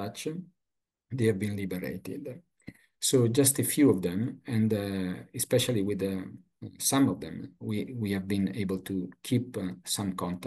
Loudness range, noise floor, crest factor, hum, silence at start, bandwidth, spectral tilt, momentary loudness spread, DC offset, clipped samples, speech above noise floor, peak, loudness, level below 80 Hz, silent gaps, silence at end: 5 LU; -87 dBFS; 20 dB; none; 0 s; 13 kHz; -5 dB/octave; 16 LU; under 0.1%; under 0.1%; 57 dB; -10 dBFS; -29 LUFS; -68 dBFS; none; 0 s